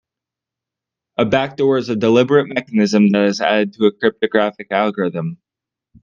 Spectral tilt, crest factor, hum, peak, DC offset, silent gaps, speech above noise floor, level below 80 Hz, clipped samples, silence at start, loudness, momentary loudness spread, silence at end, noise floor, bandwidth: -6 dB/octave; 16 dB; none; 0 dBFS; under 0.1%; none; 70 dB; -58 dBFS; under 0.1%; 1.2 s; -16 LUFS; 8 LU; 0.65 s; -86 dBFS; 7.2 kHz